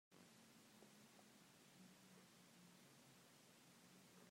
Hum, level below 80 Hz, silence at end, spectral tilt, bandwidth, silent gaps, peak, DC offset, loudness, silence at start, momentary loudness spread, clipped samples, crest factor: none; under -90 dBFS; 0 s; -3.5 dB/octave; 16 kHz; none; -52 dBFS; under 0.1%; -68 LUFS; 0.1 s; 1 LU; under 0.1%; 16 dB